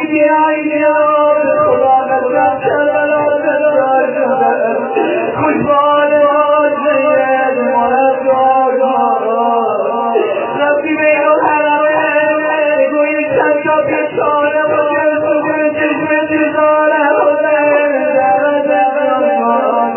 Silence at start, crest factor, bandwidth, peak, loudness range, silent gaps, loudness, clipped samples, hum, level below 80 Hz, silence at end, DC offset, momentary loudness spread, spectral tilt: 0 s; 12 dB; 3.2 kHz; 0 dBFS; 1 LU; none; -12 LUFS; under 0.1%; none; -54 dBFS; 0 s; under 0.1%; 4 LU; -9 dB/octave